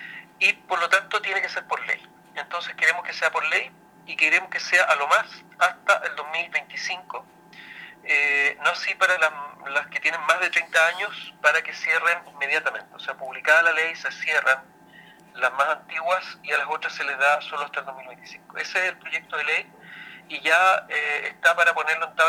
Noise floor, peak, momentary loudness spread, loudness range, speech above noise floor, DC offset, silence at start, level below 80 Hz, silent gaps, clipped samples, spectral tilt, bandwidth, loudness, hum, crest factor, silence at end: -50 dBFS; -4 dBFS; 16 LU; 4 LU; 26 dB; under 0.1%; 0 s; -76 dBFS; none; under 0.1%; -0.5 dB/octave; 17.5 kHz; -22 LUFS; none; 22 dB; 0 s